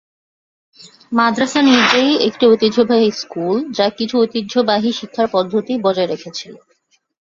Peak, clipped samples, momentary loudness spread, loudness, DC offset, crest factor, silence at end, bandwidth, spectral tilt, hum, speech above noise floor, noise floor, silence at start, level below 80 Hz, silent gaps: 0 dBFS; under 0.1%; 9 LU; -15 LUFS; under 0.1%; 16 dB; 0.65 s; 7.8 kHz; -4.5 dB/octave; none; 46 dB; -61 dBFS; 0.85 s; -60 dBFS; none